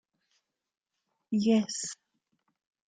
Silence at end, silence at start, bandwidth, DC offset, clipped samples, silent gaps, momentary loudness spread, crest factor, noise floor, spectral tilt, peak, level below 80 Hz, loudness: 0.95 s; 1.3 s; 9.4 kHz; under 0.1%; under 0.1%; none; 14 LU; 18 dB; -83 dBFS; -4.5 dB/octave; -16 dBFS; -76 dBFS; -29 LUFS